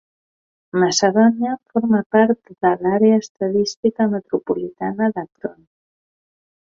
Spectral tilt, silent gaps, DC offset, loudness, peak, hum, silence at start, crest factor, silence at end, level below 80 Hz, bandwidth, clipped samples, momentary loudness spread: -5 dB/octave; 2.06-2.10 s, 3.30-3.35 s, 3.77-3.83 s; under 0.1%; -18 LUFS; -2 dBFS; none; 0.75 s; 16 dB; 1.15 s; -62 dBFS; 7.6 kHz; under 0.1%; 10 LU